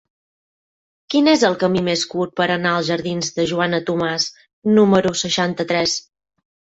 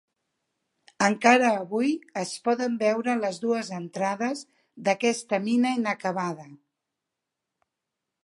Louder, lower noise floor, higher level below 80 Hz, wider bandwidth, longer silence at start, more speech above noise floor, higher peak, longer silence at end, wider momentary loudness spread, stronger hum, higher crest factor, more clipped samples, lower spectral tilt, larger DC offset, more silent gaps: first, -18 LUFS vs -25 LUFS; first, under -90 dBFS vs -85 dBFS; first, -56 dBFS vs -78 dBFS; second, 8.2 kHz vs 11.5 kHz; about the same, 1.1 s vs 1 s; first, over 72 dB vs 60 dB; about the same, -2 dBFS vs -4 dBFS; second, 0.75 s vs 1.7 s; second, 8 LU vs 11 LU; neither; second, 16 dB vs 24 dB; neither; about the same, -4.5 dB/octave vs -4.5 dB/octave; neither; first, 4.53-4.62 s vs none